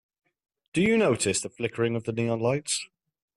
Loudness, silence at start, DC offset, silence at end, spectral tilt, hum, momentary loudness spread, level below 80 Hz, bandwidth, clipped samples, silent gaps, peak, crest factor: -26 LUFS; 0.75 s; under 0.1%; 0.5 s; -4.5 dB/octave; none; 9 LU; -62 dBFS; 12.5 kHz; under 0.1%; none; -10 dBFS; 18 dB